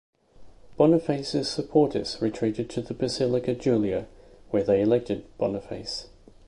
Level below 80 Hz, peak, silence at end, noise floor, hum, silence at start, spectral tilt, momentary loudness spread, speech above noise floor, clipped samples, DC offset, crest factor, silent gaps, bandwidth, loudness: -54 dBFS; -8 dBFS; 0.4 s; -48 dBFS; none; 0.4 s; -6.5 dB/octave; 11 LU; 23 dB; under 0.1%; under 0.1%; 20 dB; none; 11.5 kHz; -26 LUFS